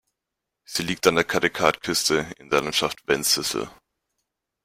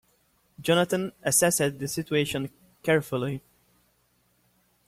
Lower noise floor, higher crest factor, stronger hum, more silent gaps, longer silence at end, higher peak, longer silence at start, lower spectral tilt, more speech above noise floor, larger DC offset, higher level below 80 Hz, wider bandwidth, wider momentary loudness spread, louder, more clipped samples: first, -84 dBFS vs -68 dBFS; about the same, 24 dB vs 20 dB; neither; neither; second, 0.9 s vs 1.5 s; first, -2 dBFS vs -8 dBFS; about the same, 0.7 s vs 0.6 s; about the same, -2.5 dB/octave vs -3.5 dB/octave; first, 61 dB vs 42 dB; neither; first, -56 dBFS vs -62 dBFS; about the same, 16.5 kHz vs 16.5 kHz; second, 8 LU vs 12 LU; first, -23 LUFS vs -26 LUFS; neither